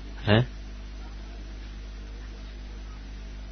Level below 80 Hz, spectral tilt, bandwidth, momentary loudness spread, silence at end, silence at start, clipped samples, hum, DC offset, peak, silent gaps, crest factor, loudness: -38 dBFS; -5 dB/octave; 6.4 kHz; 18 LU; 0 s; 0 s; under 0.1%; 50 Hz at -40 dBFS; under 0.1%; -6 dBFS; none; 24 dB; -33 LUFS